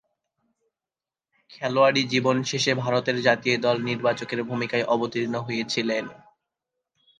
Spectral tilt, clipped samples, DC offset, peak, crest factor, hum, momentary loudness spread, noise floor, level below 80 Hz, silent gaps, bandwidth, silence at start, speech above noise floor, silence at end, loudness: -4.5 dB/octave; under 0.1%; under 0.1%; -4 dBFS; 20 dB; none; 8 LU; under -90 dBFS; -68 dBFS; none; 9.8 kHz; 1.5 s; over 66 dB; 1.05 s; -24 LUFS